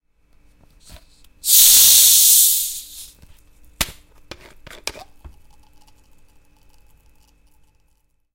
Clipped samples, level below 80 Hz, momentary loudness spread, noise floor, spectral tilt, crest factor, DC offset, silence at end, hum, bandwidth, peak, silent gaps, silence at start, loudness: under 0.1%; -48 dBFS; 25 LU; -62 dBFS; 2.5 dB/octave; 20 dB; under 0.1%; 3.45 s; none; over 20 kHz; 0 dBFS; none; 1.45 s; -10 LUFS